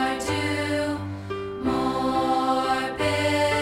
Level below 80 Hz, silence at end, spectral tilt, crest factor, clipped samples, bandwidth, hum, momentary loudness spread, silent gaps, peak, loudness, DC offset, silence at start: -48 dBFS; 0 s; -5 dB/octave; 12 dB; under 0.1%; 16.5 kHz; none; 9 LU; none; -12 dBFS; -25 LUFS; under 0.1%; 0 s